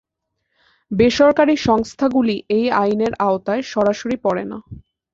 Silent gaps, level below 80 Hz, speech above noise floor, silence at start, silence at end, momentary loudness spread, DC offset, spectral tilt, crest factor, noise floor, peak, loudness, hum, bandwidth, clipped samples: none; -48 dBFS; 57 dB; 0.9 s; 0.35 s; 9 LU; under 0.1%; -5.5 dB/octave; 16 dB; -75 dBFS; -2 dBFS; -18 LUFS; none; 7.8 kHz; under 0.1%